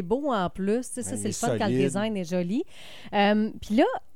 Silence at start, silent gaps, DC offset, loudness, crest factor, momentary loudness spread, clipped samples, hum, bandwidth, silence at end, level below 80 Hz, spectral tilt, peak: 0 s; none; 0.7%; -26 LUFS; 18 dB; 8 LU; under 0.1%; none; 16 kHz; 0.15 s; -54 dBFS; -5 dB/octave; -8 dBFS